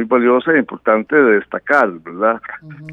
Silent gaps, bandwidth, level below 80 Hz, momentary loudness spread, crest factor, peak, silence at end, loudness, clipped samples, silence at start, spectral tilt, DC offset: none; 7.4 kHz; -62 dBFS; 10 LU; 16 dB; 0 dBFS; 0 s; -15 LUFS; under 0.1%; 0 s; -7.5 dB/octave; under 0.1%